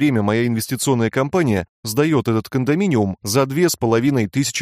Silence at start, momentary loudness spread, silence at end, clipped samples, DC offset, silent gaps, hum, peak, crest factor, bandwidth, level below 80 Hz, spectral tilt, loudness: 0 s; 4 LU; 0 s; under 0.1%; under 0.1%; 1.69-1.83 s; none; -4 dBFS; 14 dB; 15.5 kHz; -52 dBFS; -5.5 dB/octave; -19 LUFS